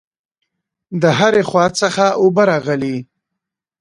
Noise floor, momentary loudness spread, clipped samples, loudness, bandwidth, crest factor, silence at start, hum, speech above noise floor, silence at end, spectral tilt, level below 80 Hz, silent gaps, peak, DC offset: -80 dBFS; 10 LU; under 0.1%; -14 LUFS; 11.5 kHz; 16 dB; 0.9 s; none; 66 dB; 0.75 s; -5 dB/octave; -56 dBFS; none; 0 dBFS; under 0.1%